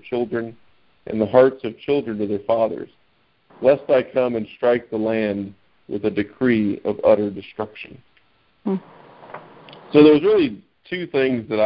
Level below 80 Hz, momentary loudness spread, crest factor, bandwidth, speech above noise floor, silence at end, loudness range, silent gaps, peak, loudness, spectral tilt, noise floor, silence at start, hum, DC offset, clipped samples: -56 dBFS; 19 LU; 20 dB; 5.4 kHz; 44 dB; 0 s; 3 LU; none; -2 dBFS; -20 LUFS; -11 dB/octave; -63 dBFS; 0.05 s; none; under 0.1%; under 0.1%